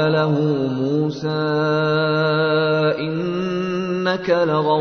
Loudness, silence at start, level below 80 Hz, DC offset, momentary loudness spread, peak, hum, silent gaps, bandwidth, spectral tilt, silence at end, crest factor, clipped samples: -19 LUFS; 0 s; -58 dBFS; under 0.1%; 5 LU; -6 dBFS; none; none; 6.6 kHz; -7.5 dB/octave; 0 s; 14 dB; under 0.1%